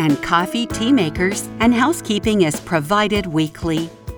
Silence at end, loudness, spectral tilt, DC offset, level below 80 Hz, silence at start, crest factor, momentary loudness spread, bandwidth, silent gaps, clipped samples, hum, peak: 0 s; -18 LUFS; -5 dB/octave; under 0.1%; -40 dBFS; 0 s; 16 dB; 5 LU; over 20 kHz; none; under 0.1%; none; -2 dBFS